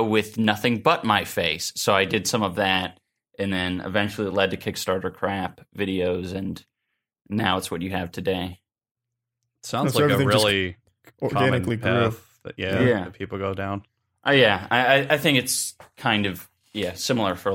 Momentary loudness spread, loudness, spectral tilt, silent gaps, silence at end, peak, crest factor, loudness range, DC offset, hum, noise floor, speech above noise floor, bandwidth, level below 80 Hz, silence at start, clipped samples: 12 LU; -23 LUFS; -4.5 dB/octave; 8.91-8.95 s; 0 s; -2 dBFS; 22 dB; 6 LU; under 0.1%; none; -82 dBFS; 58 dB; 17 kHz; -56 dBFS; 0 s; under 0.1%